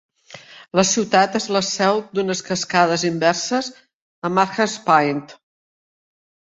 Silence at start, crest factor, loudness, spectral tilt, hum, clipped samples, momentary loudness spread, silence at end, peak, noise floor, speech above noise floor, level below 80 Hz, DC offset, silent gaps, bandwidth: 0.3 s; 20 dB; -19 LUFS; -3.5 dB/octave; none; under 0.1%; 9 LU; 1.15 s; -2 dBFS; -43 dBFS; 24 dB; -60 dBFS; under 0.1%; 3.94-4.22 s; 8.2 kHz